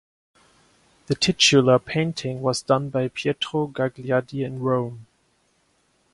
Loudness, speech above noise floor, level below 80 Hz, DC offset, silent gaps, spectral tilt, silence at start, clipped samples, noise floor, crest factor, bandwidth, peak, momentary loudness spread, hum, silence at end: -22 LUFS; 44 dB; -58 dBFS; under 0.1%; none; -4.5 dB/octave; 1.1 s; under 0.1%; -66 dBFS; 20 dB; 11.5 kHz; -4 dBFS; 11 LU; none; 1.1 s